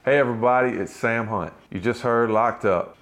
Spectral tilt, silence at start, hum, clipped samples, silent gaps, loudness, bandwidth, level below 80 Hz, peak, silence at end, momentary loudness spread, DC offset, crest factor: -6.5 dB/octave; 0.05 s; none; under 0.1%; none; -22 LUFS; 13 kHz; -60 dBFS; -8 dBFS; 0.1 s; 8 LU; under 0.1%; 14 dB